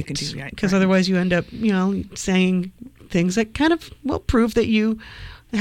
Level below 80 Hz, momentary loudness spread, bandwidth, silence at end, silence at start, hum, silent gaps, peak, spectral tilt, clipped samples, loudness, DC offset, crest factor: -40 dBFS; 10 LU; 12.5 kHz; 0 s; 0 s; none; none; -6 dBFS; -5.5 dB/octave; under 0.1%; -21 LUFS; under 0.1%; 14 dB